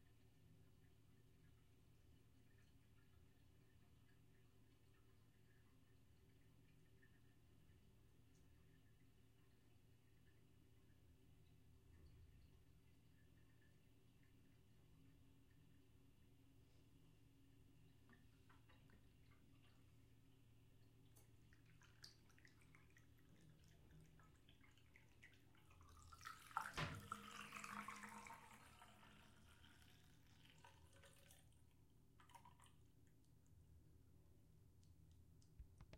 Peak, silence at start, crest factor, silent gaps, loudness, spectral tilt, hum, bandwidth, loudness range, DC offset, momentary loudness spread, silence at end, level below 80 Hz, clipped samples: -30 dBFS; 0 s; 36 dB; none; -56 LUFS; -4 dB/octave; none; 16 kHz; 15 LU; under 0.1%; 18 LU; 0 s; -78 dBFS; under 0.1%